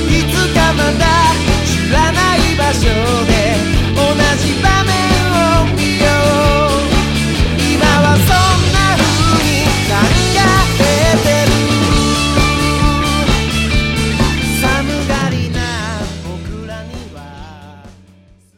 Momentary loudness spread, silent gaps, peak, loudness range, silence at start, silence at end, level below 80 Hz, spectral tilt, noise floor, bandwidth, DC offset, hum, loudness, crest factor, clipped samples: 8 LU; none; 0 dBFS; 6 LU; 0 s; 0.65 s; -20 dBFS; -4.5 dB/octave; -45 dBFS; 16.5 kHz; under 0.1%; none; -12 LUFS; 12 dB; under 0.1%